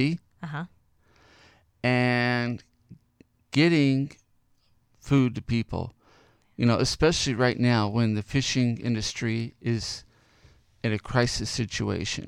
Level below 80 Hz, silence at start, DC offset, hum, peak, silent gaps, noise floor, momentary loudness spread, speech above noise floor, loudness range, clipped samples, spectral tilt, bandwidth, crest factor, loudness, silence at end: -48 dBFS; 0 s; under 0.1%; none; -6 dBFS; none; -65 dBFS; 13 LU; 41 dB; 4 LU; under 0.1%; -5.5 dB/octave; 11.5 kHz; 20 dB; -26 LUFS; 0 s